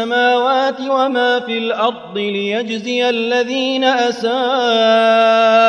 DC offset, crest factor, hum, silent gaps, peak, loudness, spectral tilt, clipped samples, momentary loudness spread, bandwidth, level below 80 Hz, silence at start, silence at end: under 0.1%; 14 dB; none; none; -2 dBFS; -15 LUFS; -3.5 dB/octave; under 0.1%; 8 LU; 9.8 kHz; -64 dBFS; 0 s; 0 s